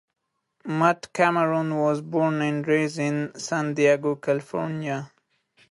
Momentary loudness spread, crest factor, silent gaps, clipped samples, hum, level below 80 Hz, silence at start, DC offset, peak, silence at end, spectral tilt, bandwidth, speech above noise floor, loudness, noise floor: 9 LU; 20 dB; none; under 0.1%; none; -72 dBFS; 0.65 s; under 0.1%; -4 dBFS; 0.65 s; -6 dB/octave; 11.5 kHz; 41 dB; -24 LUFS; -64 dBFS